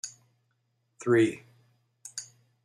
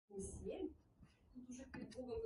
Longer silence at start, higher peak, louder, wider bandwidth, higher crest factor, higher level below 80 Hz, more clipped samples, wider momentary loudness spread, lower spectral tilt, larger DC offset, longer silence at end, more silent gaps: about the same, 0.05 s vs 0.1 s; first, -12 dBFS vs -36 dBFS; first, -27 LUFS vs -52 LUFS; about the same, 12 kHz vs 11.5 kHz; about the same, 20 dB vs 16 dB; second, -76 dBFS vs -64 dBFS; neither; first, 24 LU vs 15 LU; about the same, -5 dB/octave vs -5.5 dB/octave; neither; first, 0.4 s vs 0 s; neither